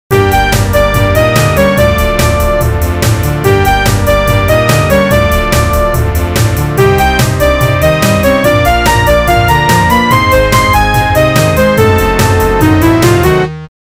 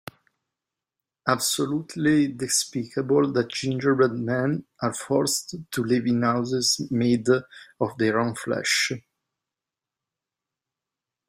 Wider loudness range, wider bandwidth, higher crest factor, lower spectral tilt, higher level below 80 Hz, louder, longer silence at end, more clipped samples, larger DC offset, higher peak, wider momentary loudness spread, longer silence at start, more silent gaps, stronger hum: about the same, 2 LU vs 4 LU; about the same, 16.5 kHz vs 16 kHz; second, 8 dB vs 20 dB; first, -5.5 dB/octave vs -4 dB/octave; first, -18 dBFS vs -64 dBFS; first, -9 LUFS vs -24 LUFS; second, 0.15 s vs 2.3 s; neither; neither; first, 0 dBFS vs -4 dBFS; second, 4 LU vs 8 LU; second, 0.1 s vs 1.25 s; neither; neither